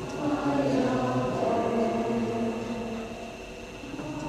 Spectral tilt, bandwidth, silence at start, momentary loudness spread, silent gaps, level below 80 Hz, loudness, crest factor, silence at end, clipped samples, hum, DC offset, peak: -6.5 dB/octave; 13.5 kHz; 0 s; 13 LU; none; -52 dBFS; -29 LUFS; 14 dB; 0 s; under 0.1%; none; under 0.1%; -14 dBFS